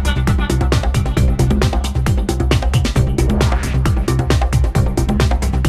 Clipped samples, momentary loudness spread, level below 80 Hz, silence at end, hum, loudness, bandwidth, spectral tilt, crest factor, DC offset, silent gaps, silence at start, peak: under 0.1%; 2 LU; -18 dBFS; 0 s; none; -16 LUFS; 14 kHz; -6 dB/octave; 12 dB; under 0.1%; none; 0 s; -2 dBFS